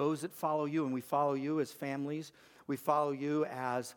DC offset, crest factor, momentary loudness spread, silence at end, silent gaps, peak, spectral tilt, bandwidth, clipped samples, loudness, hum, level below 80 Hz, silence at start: under 0.1%; 18 dB; 9 LU; 0.05 s; none; -16 dBFS; -6.5 dB/octave; 19 kHz; under 0.1%; -35 LUFS; none; -84 dBFS; 0 s